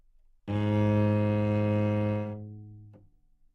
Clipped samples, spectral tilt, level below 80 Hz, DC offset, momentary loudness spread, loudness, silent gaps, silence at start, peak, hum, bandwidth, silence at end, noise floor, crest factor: under 0.1%; -9.5 dB/octave; -58 dBFS; under 0.1%; 19 LU; -28 LUFS; none; 0.45 s; -16 dBFS; none; 4.7 kHz; 0.65 s; -61 dBFS; 14 dB